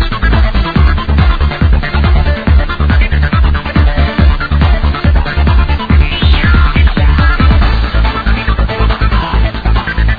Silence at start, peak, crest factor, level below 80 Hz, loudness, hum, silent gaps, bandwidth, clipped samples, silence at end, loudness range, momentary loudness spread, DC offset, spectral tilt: 0 s; 0 dBFS; 8 dB; -10 dBFS; -11 LUFS; none; none; 5 kHz; 0.2%; 0 s; 1 LU; 4 LU; 0.4%; -8.5 dB/octave